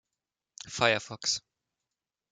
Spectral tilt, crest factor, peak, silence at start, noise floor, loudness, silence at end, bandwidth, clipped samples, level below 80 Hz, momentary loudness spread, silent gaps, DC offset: -2 dB/octave; 28 dB; -6 dBFS; 0.65 s; -89 dBFS; -29 LUFS; 0.95 s; 10 kHz; under 0.1%; -70 dBFS; 14 LU; none; under 0.1%